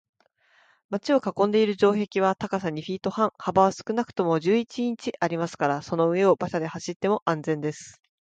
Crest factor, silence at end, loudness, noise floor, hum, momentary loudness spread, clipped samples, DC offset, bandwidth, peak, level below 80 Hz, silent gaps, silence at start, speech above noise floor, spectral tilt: 20 dB; 0.35 s; -25 LUFS; -63 dBFS; none; 8 LU; under 0.1%; under 0.1%; 9 kHz; -6 dBFS; -64 dBFS; 6.96-7.00 s, 7.22-7.26 s; 0.9 s; 39 dB; -6 dB/octave